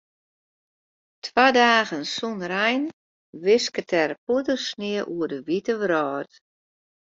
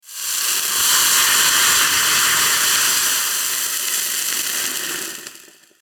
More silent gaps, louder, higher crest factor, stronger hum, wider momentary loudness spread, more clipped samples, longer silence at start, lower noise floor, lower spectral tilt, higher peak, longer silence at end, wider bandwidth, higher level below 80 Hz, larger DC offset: first, 2.93-3.33 s, 4.18-4.27 s vs none; second, -23 LUFS vs -15 LUFS; first, 22 dB vs 16 dB; neither; about the same, 11 LU vs 10 LU; neither; first, 1.25 s vs 0.05 s; first, under -90 dBFS vs -45 dBFS; first, -3.5 dB/octave vs 2 dB/octave; about the same, -2 dBFS vs -2 dBFS; first, 0.9 s vs 0.45 s; second, 7.8 kHz vs 19.5 kHz; second, -70 dBFS vs -60 dBFS; neither